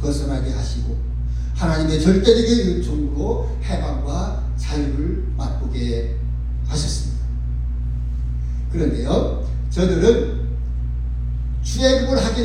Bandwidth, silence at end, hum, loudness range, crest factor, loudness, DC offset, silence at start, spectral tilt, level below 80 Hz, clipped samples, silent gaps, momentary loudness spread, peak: 10.5 kHz; 0 s; 60 Hz at -35 dBFS; 5 LU; 18 dB; -21 LUFS; under 0.1%; 0 s; -6 dB/octave; -22 dBFS; under 0.1%; none; 10 LU; -2 dBFS